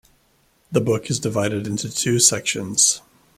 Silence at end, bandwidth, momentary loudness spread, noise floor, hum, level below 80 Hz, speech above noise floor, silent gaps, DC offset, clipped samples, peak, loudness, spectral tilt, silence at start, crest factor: 0.4 s; 16 kHz; 9 LU; -61 dBFS; none; -56 dBFS; 41 dB; none; under 0.1%; under 0.1%; 0 dBFS; -19 LUFS; -3 dB/octave; 0.7 s; 22 dB